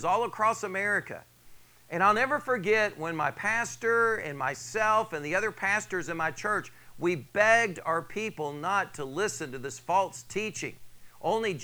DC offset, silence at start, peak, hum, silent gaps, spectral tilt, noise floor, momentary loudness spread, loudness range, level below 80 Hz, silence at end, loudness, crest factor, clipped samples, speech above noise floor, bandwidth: under 0.1%; 0 s; -8 dBFS; none; none; -4 dB/octave; -53 dBFS; 10 LU; 4 LU; -64 dBFS; 0 s; -28 LUFS; 22 dB; under 0.1%; 24 dB; over 20 kHz